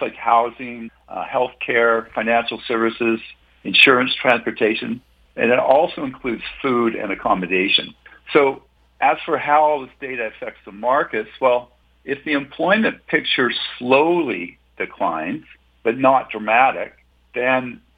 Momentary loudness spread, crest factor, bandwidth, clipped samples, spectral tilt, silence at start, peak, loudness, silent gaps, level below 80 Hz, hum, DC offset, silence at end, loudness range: 14 LU; 20 dB; 9 kHz; under 0.1%; -6 dB/octave; 0 s; 0 dBFS; -19 LUFS; none; -56 dBFS; none; under 0.1%; 0.2 s; 4 LU